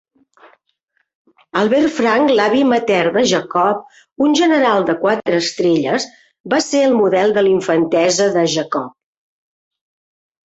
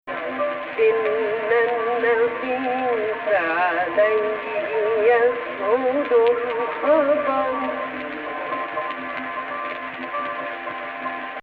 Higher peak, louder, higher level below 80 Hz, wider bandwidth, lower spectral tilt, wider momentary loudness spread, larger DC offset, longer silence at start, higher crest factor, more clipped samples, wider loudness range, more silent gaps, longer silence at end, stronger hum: first, -2 dBFS vs -6 dBFS; first, -15 LUFS vs -22 LUFS; about the same, -60 dBFS vs -64 dBFS; first, 8.2 kHz vs 4.8 kHz; second, -4 dB/octave vs -6.5 dB/octave; second, 6 LU vs 11 LU; neither; first, 1.55 s vs 0.05 s; about the same, 14 dB vs 16 dB; neither; second, 2 LU vs 7 LU; first, 6.40-6.44 s vs none; first, 1.55 s vs 0 s; neither